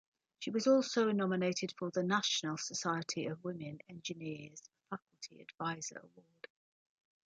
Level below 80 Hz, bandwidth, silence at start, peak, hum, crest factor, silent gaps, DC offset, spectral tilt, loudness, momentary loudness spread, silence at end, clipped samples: -82 dBFS; 9.4 kHz; 0.4 s; -18 dBFS; none; 20 dB; 5.02-5.07 s; under 0.1%; -4 dB/octave; -36 LUFS; 22 LU; 1.05 s; under 0.1%